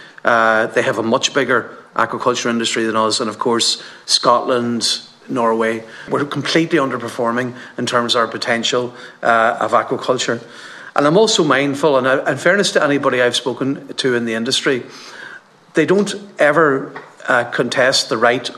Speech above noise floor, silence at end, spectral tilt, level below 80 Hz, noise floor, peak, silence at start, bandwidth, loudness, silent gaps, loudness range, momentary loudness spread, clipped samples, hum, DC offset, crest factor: 22 dB; 0 s; -3.5 dB/octave; -66 dBFS; -39 dBFS; 0 dBFS; 0 s; 13.5 kHz; -16 LUFS; none; 3 LU; 10 LU; under 0.1%; none; under 0.1%; 16 dB